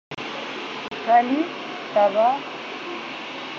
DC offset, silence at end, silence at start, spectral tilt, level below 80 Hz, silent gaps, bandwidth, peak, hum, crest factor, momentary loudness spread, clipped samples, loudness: under 0.1%; 0 s; 0.1 s; -1.5 dB/octave; -72 dBFS; none; 7.4 kHz; -6 dBFS; none; 18 dB; 13 LU; under 0.1%; -24 LUFS